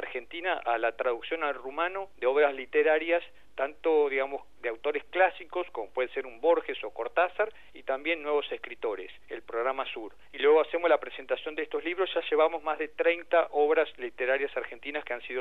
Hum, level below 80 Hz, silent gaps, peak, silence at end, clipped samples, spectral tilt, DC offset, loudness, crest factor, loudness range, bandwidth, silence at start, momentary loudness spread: none; -68 dBFS; none; -10 dBFS; 0 s; under 0.1%; -4.5 dB/octave; 0.4%; -29 LUFS; 20 dB; 3 LU; 4.3 kHz; 0 s; 11 LU